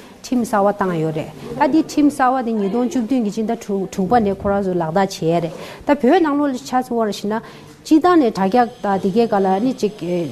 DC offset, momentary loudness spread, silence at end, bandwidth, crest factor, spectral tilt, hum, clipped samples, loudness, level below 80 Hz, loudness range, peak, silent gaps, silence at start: under 0.1%; 8 LU; 0 s; 13.5 kHz; 14 dB; -6.5 dB/octave; none; under 0.1%; -18 LUFS; -48 dBFS; 2 LU; -4 dBFS; none; 0 s